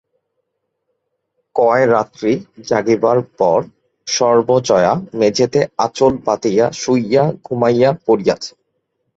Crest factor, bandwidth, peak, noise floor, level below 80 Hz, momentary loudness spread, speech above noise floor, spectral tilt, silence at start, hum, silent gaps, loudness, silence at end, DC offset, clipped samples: 14 dB; 8 kHz; -2 dBFS; -72 dBFS; -54 dBFS; 6 LU; 58 dB; -5 dB/octave; 1.55 s; none; none; -15 LUFS; 0.7 s; under 0.1%; under 0.1%